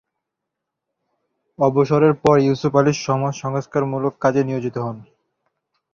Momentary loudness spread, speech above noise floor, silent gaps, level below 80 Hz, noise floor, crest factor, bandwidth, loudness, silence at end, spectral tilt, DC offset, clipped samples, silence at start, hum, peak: 10 LU; 63 dB; none; -56 dBFS; -81 dBFS; 18 dB; 7.4 kHz; -19 LUFS; 0.9 s; -7 dB/octave; under 0.1%; under 0.1%; 1.6 s; none; -2 dBFS